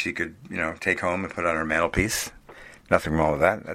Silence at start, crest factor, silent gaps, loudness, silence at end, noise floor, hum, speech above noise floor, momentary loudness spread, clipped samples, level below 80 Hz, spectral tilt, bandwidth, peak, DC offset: 0 s; 24 dB; none; -25 LUFS; 0 s; -47 dBFS; none; 22 dB; 8 LU; under 0.1%; -44 dBFS; -4.5 dB/octave; 16 kHz; -2 dBFS; under 0.1%